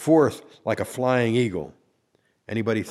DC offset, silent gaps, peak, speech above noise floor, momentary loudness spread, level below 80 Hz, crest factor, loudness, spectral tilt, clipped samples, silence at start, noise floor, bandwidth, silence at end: under 0.1%; none; -6 dBFS; 45 dB; 13 LU; -60 dBFS; 18 dB; -24 LUFS; -6.5 dB/octave; under 0.1%; 0 s; -68 dBFS; 14.5 kHz; 0 s